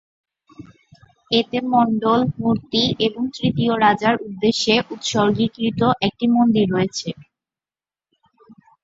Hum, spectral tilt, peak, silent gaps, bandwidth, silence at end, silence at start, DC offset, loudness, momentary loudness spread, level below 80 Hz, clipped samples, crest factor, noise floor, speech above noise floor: none; -5 dB/octave; -2 dBFS; none; 7.8 kHz; 0.3 s; 0.6 s; under 0.1%; -19 LUFS; 6 LU; -54 dBFS; under 0.1%; 18 dB; under -90 dBFS; over 71 dB